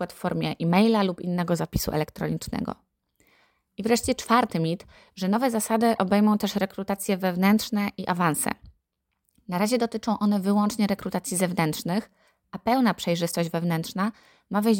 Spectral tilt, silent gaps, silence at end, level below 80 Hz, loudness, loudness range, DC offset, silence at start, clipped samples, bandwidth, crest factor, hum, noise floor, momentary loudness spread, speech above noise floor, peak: -5.5 dB/octave; none; 0 s; -52 dBFS; -25 LUFS; 3 LU; under 0.1%; 0 s; under 0.1%; 17 kHz; 18 dB; none; -79 dBFS; 9 LU; 54 dB; -6 dBFS